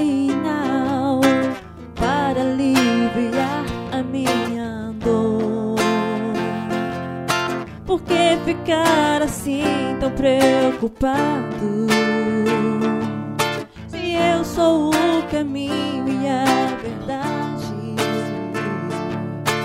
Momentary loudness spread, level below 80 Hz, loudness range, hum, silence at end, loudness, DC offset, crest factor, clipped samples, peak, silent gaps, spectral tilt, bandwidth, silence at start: 9 LU; -44 dBFS; 3 LU; none; 0 s; -20 LUFS; under 0.1%; 18 dB; under 0.1%; -2 dBFS; none; -5 dB/octave; 16 kHz; 0 s